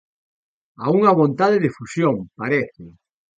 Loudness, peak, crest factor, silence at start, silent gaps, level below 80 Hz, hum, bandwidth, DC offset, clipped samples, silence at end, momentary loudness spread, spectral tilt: -19 LUFS; -2 dBFS; 20 dB; 0.8 s; none; -60 dBFS; none; 9.2 kHz; under 0.1%; under 0.1%; 0.5 s; 10 LU; -7.5 dB/octave